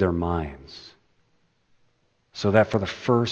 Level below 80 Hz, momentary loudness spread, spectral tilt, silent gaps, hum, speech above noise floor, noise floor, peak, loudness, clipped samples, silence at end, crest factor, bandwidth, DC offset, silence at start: -46 dBFS; 22 LU; -7 dB/octave; none; none; 44 dB; -67 dBFS; -2 dBFS; -24 LUFS; under 0.1%; 0 s; 24 dB; 8.4 kHz; under 0.1%; 0 s